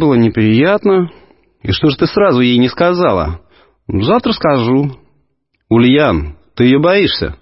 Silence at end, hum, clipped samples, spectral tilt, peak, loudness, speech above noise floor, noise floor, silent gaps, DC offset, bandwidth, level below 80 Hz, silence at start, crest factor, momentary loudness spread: 0.05 s; none; under 0.1%; -10 dB/octave; 0 dBFS; -12 LUFS; 52 dB; -63 dBFS; none; under 0.1%; 5.8 kHz; -34 dBFS; 0 s; 12 dB; 11 LU